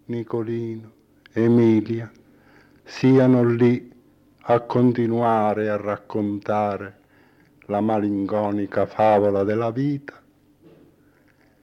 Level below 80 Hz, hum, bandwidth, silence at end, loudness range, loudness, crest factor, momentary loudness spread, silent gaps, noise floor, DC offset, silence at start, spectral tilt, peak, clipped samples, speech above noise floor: -66 dBFS; none; 6.6 kHz; 1.55 s; 4 LU; -21 LUFS; 14 dB; 14 LU; none; -58 dBFS; under 0.1%; 0.1 s; -9 dB/octave; -8 dBFS; under 0.1%; 37 dB